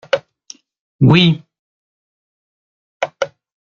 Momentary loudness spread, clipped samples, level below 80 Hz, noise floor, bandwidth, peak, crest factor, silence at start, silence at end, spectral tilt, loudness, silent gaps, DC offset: 15 LU; under 0.1%; -52 dBFS; -43 dBFS; 7.2 kHz; 0 dBFS; 18 dB; 0.15 s; 0.35 s; -6.5 dB/octave; -16 LUFS; 0.80-0.99 s, 1.59-3.00 s; under 0.1%